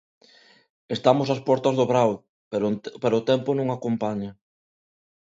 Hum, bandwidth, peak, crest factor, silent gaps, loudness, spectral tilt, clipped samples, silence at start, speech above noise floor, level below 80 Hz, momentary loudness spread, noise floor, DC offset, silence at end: none; 7.8 kHz; -4 dBFS; 20 dB; 2.29-2.51 s; -24 LUFS; -7 dB/octave; under 0.1%; 0.9 s; 33 dB; -66 dBFS; 11 LU; -56 dBFS; under 0.1%; 0.95 s